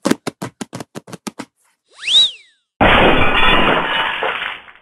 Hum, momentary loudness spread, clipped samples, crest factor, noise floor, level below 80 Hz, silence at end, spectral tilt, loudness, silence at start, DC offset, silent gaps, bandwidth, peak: none; 20 LU; under 0.1%; 16 dB; -58 dBFS; -28 dBFS; 0.2 s; -3.5 dB/octave; -14 LUFS; 0.05 s; under 0.1%; 2.76-2.80 s; 13 kHz; 0 dBFS